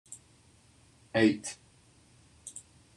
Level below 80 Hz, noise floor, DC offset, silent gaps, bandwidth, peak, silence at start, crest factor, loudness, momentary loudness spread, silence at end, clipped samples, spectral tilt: -70 dBFS; -62 dBFS; under 0.1%; none; 12 kHz; -12 dBFS; 0.1 s; 22 dB; -29 LUFS; 23 LU; 0.35 s; under 0.1%; -4.5 dB/octave